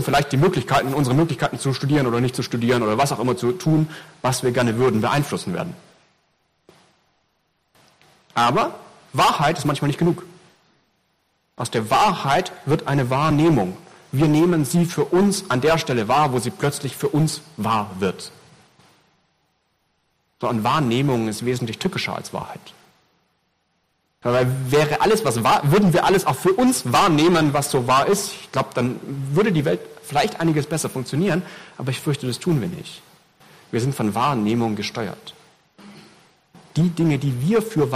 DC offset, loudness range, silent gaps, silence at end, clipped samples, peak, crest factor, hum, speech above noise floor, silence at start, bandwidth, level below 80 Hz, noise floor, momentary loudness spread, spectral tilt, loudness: under 0.1%; 8 LU; none; 0 s; under 0.1%; -10 dBFS; 12 dB; none; 49 dB; 0 s; 15.5 kHz; -52 dBFS; -69 dBFS; 11 LU; -5.5 dB/octave; -20 LUFS